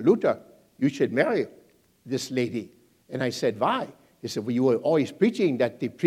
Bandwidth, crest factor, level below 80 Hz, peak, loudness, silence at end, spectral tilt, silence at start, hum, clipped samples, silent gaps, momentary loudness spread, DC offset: 15.5 kHz; 18 dB; -74 dBFS; -8 dBFS; -26 LUFS; 0 s; -6 dB/octave; 0 s; none; under 0.1%; none; 13 LU; under 0.1%